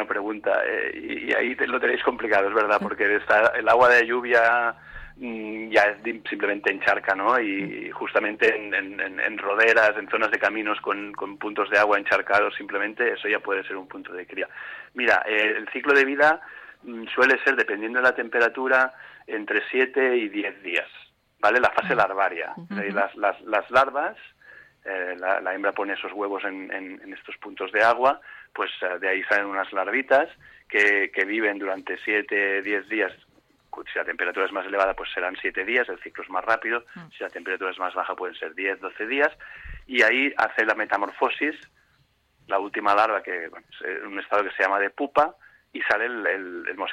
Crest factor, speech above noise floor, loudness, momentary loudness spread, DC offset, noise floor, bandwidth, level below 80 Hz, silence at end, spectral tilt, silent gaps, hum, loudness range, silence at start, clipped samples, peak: 18 dB; 41 dB; -23 LUFS; 14 LU; under 0.1%; -65 dBFS; 12.5 kHz; -60 dBFS; 0 s; -4.5 dB/octave; none; none; 6 LU; 0 s; under 0.1%; -6 dBFS